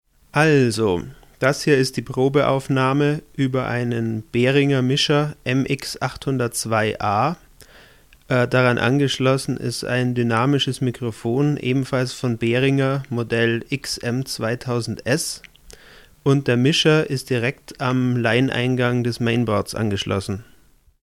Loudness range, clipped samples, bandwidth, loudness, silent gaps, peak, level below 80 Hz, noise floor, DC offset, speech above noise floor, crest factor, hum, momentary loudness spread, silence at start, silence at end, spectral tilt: 3 LU; under 0.1%; 15 kHz; -20 LUFS; none; -4 dBFS; -50 dBFS; -50 dBFS; under 0.1%; 30 dB; 18 dB; none; 8 LU; 0.35 s; 0.65 s; -5.5 dB/octave